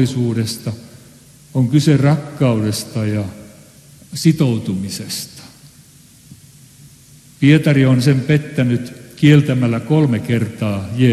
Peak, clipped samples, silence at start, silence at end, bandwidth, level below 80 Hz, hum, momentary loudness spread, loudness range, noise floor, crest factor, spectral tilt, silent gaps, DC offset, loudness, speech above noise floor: 0 dBFS; under 0.1%; 0 s; 0 s; 13 kHz; -52 dBFS; none; 13 LU; 8 LU; -45 dBFS; 16 dB; -6.5 dB/octave; none; under 0.1%; -16 LUFS; 30 dB